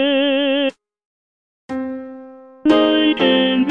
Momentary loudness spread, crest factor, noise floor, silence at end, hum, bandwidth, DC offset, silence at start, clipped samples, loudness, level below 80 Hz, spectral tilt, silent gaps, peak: 16 LU; 18 dB; -39 dBFS; 0 s; none; 7.2 kHz; under 0.1%; 0 s; under 0.1%; -16 LUFS; -58 dBFS; -6 dB/octave; 1.05-1.69 s; 0 dBFS